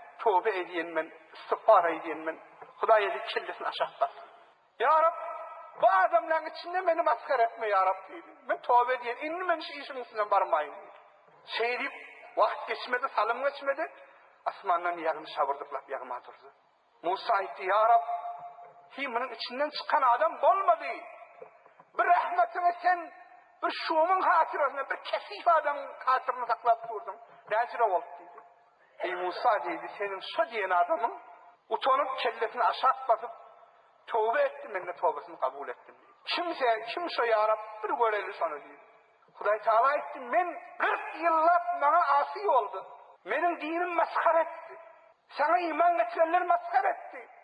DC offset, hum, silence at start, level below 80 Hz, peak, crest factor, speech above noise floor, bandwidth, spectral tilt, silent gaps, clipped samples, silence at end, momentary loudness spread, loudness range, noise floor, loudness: under 0.1%; none; 0 s; under -90 dBFS; -10 dBFS; 20 dB; 33 dB; 5.2 kHz; -4 dB/octave; none; under 0.1%; 0.2 s; 14 LU; 4 LU; -62 dBFS; -29 LUFS